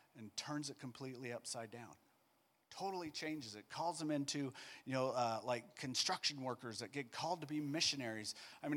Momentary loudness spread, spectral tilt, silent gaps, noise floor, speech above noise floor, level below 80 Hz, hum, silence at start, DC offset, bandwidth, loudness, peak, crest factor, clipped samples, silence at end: 12 LU; -3.5 dB/octave; none; -78 dBFS; 34 dB; -86 dBFS; none; 0.15 s; under 0.1%; 17.5 kHz; -42 LUFS; -22 dBFS; 22 dB; under 0.1%; 0 s